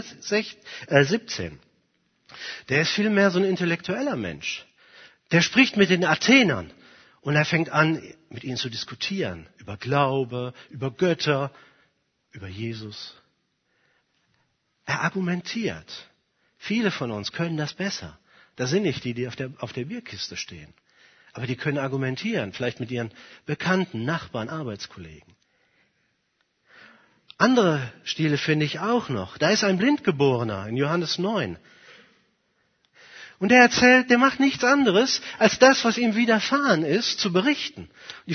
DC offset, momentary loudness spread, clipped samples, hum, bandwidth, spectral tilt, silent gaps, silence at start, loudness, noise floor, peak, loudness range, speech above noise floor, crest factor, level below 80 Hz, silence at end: under 0.1%; 19 LU; under 0.1%; none; 6.6 kHz; -4.5 dB/octave; none; 0 s; -23 LUFS; -72 dBFS; 0 dBFS; 12 LU; 49 dB; 24 dB; -62 dBFS; 0 s